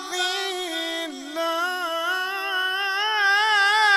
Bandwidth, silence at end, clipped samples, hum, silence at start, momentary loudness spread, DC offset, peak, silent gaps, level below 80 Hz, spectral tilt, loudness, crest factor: 16 kHz; 0 s; under 0.1%; none; 0 s; 10 LU; under 0.1%; -8 dBFS; none; -76 dBFS; 1.5 dB/octave; -22 LUFS; 16 dB